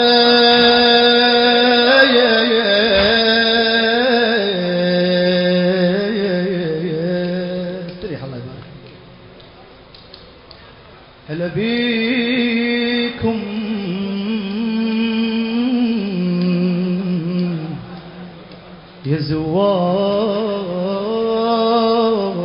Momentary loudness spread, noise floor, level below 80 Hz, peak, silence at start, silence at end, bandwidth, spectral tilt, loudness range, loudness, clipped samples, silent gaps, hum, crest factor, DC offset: 15 LU; -42 dBFS; -48 dBFS; 0 dBFS; 0 s; 0 s; 5.4 kHz; -9.5 dB/octave; 14 LU; -15 LUFS; under 0.1%; none; none; 16 dB; under 0.1%